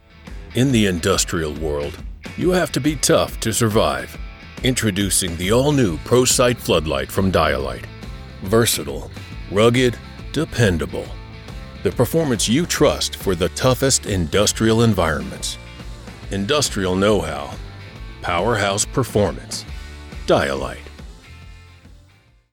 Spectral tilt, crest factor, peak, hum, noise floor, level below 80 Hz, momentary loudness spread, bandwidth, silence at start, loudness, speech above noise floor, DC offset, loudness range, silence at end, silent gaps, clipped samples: -4 dB/octave; 16 dB; -4 dBFS; none; -52 dBFS; -36 dBFS; 19 LU; 19 kHz; 0.2 s; -19 LUFS; 34 dB; under 0.1%; 4 LU; 0.65 s; none; under 0.1%